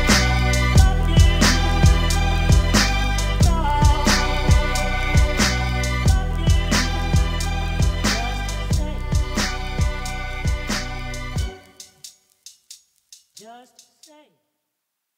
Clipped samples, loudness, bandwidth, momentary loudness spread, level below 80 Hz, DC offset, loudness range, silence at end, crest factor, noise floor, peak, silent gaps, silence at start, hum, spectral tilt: under 0.1%; -20 LUFS; 16 kHz; 11 LU; -22 dBFS; under 0.1%; 12 LU; 1.6 s; 18 dB; -78 dBFS; -2 dBFS; none; 0 s; none; -4.5 dB/octave